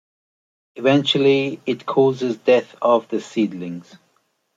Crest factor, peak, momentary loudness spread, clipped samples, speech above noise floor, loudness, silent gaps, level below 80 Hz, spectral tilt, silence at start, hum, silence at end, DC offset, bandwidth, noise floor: 18 dB; -2 dBFS; 10 LU; under 0.1%; 47 dB; -19 LUFS; none; -70 dBFS; -6 dB/octave; 0.75 s; none; 0.75 s; under 0.1%; 7.8 kHz; -66 dBFS